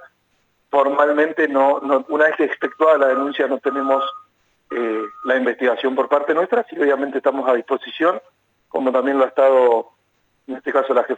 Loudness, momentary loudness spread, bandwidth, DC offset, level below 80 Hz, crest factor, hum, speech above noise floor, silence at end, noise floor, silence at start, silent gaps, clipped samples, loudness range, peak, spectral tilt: -18 LUFS; 9 LU; 7.8 kHz; under 0.1%; -76 dBFS; 16 dB; none; 47 dB; 0 s; -65 dBFS; 0 s; none; under 0.1%; 3 LU; -4 dBFS; -5 dB/octave